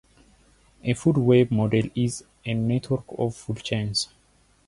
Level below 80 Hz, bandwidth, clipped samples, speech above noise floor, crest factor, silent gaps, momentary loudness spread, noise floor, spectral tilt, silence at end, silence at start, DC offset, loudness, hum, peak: -52 dBFS; 11.5 kHz; under 0.1%; 38 dB; 18 dB; none; 12 LU; -61 dBFS; -6 dB/octave; 0.6 s; 0.85 s; under 0.1%; -25 LUFS; none; -6 dBFS